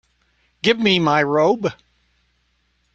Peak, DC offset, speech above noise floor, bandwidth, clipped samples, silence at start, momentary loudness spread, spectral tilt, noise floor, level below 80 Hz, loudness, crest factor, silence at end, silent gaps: -2 dBFS; under 0.1%; 48 dB; 8 kHz; under 0.1%; 0.65 s; 7 LU; -5.5 dB/octave; -65 dBFS; -60 dBFS; -18 LUFS; 20 dB; 1.2 s; none